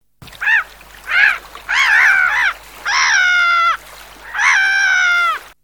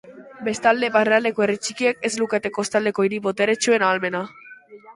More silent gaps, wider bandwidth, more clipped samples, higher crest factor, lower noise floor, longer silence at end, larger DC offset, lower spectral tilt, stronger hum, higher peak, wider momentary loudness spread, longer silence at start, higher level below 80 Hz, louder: neither; first, 19.5 kHz vs 11.5 kHz; neither; about the same, 16 dB vs 18 dB; second, -37 dBFS vs -44 dBFS; first, 0.25 s vs 0.05 s; first, 0.1% vs under 0.1%; second, 2 dB/octave vs -3.5 dB/octave; first, 50 Hz at -50 dBFS vs none; first, 0 dBFS vs -4 dBFS; first, 13 LU vs 8 LU; first, 0.2 s vs 0.05 s; first, -48 dBFS vs -66 dBFS; first, -13 LUFS vs -21 LUFS